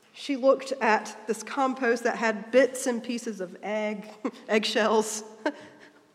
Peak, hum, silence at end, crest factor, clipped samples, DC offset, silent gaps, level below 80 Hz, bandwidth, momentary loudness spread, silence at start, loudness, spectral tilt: -8 dBFS; none; 0.25 s; 20 dB; under 0.1%; under 0.1%; none; -84 dBFS; 15 kHz; 11 LU; 0.15 s; -27 LUFS; -3 dB/octave